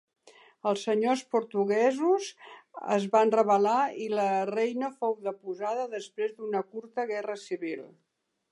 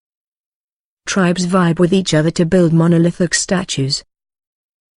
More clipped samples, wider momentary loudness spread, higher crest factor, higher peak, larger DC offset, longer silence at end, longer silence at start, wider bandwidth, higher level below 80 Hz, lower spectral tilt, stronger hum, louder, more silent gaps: neither; first, 12 LU vs 7 LU; about the same, 18 dB vs 14 dB; second, -10 dBFS vs -2 dBFS; neither; second, 0.65 s vs 1 s; second, 0.65 s vs 1.05 s; about the same, 11.5 kHz vs 11 kHz; second, -86 dBFS vs -46 dBFS; about the same, -5 dB/octave vs -5 dB/octave; neither; second, -29 LUFS vs -15 LUFS; neither